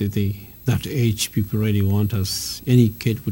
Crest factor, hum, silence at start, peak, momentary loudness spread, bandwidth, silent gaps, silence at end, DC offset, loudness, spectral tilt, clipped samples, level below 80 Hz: 18 dB; none; 0 s; -2 dBFS; 7 LU; 17.5 kHz; none; 0 s; under 0.1%; -21 LUFS; -6 dB/octave; under 0.1%; -46 dBFS